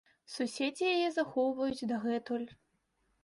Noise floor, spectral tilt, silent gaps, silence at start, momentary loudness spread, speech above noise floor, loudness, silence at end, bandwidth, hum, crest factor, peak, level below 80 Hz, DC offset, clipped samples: -77 dBFS; -4 dB/octave; none; 0.3 s; 8 LU; 44 dB; -34 LUFS; 0.7 s; 11.5 kHz; none; 16 dB; -18 dBFS; -72 dBFS; under 0.1%; under 0.1%